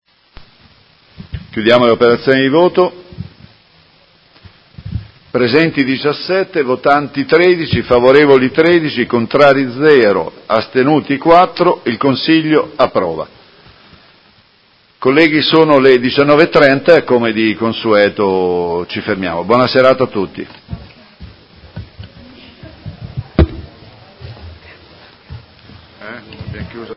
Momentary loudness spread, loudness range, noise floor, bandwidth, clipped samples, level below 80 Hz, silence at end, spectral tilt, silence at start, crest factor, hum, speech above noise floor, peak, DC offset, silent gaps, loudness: 22 LU; 13 LU; -51 dBFS; 8 kHz; 0.2%; -34 dBFS; 0 s; -7.5 dB/octave; 1.2 s; 14 dB; none; 40 dB; 0 dBFS; under 0.1%; none; -11 LUFS